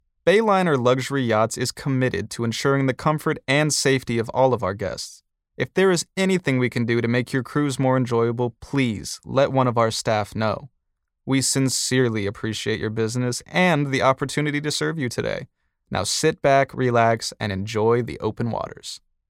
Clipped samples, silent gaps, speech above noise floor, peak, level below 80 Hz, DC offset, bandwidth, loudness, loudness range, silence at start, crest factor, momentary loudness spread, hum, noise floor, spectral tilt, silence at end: under 0.1%; none; 53 dB; -4 dBFS; -54 dBFS; under 0.1%; 16.5 kHz; -22 LUFS; 1 LU; 0.25 s; 18 dB; 8 LU; none; -74 dBFS; -5 dB/octave; 0.3 s